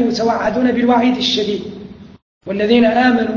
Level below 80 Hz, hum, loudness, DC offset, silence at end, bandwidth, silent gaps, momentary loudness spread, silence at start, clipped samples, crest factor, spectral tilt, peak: -48 dBFS; none; -15 LUFS; under 0.1%; 0 s; 7.2 kHz; 2.22-2.41 s; 15 LU; 0 s; under 0.1%; 16 dB; -5 dB/octave; 0 dBFS